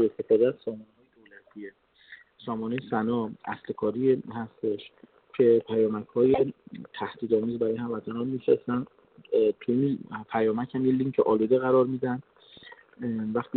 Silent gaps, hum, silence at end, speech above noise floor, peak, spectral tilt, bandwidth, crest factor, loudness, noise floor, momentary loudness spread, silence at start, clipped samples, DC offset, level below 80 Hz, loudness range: none; none; 0 s; 29 dB; -10 dBFS; -7 dB/octave; 4.4 kHz; 18 dB; -27 LUFS; -56 dBFS; 15 LU; 0 s; under 0.1%; under 0.1%; -68 dBFS; 5 LU